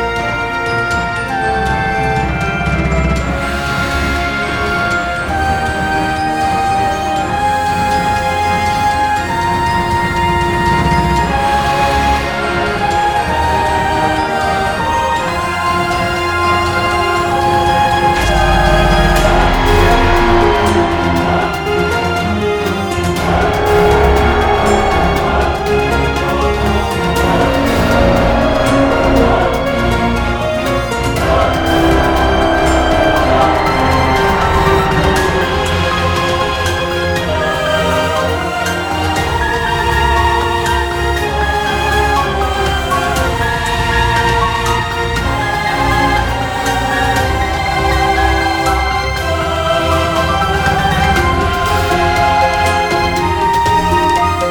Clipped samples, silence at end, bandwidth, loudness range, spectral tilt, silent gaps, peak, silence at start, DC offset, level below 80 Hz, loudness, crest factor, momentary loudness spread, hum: under 0.1%; 0 s; 19 kHz; 3 LU; -5 dB/octave; none; 0 dBFS; 0 s; under 0.1%; -22 dBFS; -13 LUFS; 12 dB; 4 LU; none